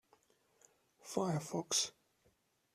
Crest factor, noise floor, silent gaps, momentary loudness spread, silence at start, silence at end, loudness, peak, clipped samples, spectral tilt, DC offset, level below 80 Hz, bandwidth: 22 dB; -76 dBFS; none; 8 LU; 1.05 s; 0.85 s; -38 LUFS; -20 dBFS; under 0.1%; -3.5 dB/octave; under 0.1%; -82 dBFS; 14.5 kHz